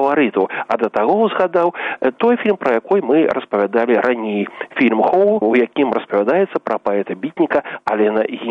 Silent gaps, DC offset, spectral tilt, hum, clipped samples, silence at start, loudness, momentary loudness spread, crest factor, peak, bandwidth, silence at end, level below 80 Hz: none; under 0.1%; -7.5 dB/octave; none; under 0.1%; 0 s; -17 LUFS; 6 LU; 14 dB; -2 dBFS; 6 kHz; 0 s; -62 dBFS